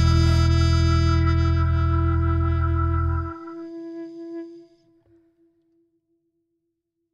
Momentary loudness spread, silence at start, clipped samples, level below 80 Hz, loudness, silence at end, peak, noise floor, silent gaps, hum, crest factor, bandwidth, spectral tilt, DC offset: 17 LU; 0 s; under 0.1%; -28 dBFS; -21 LUFS; 2.55 s; -8 dBFS; -78 dBFS; none; none; 14 dB; 7.8 kHz; -7 dB/octave; under 0.1%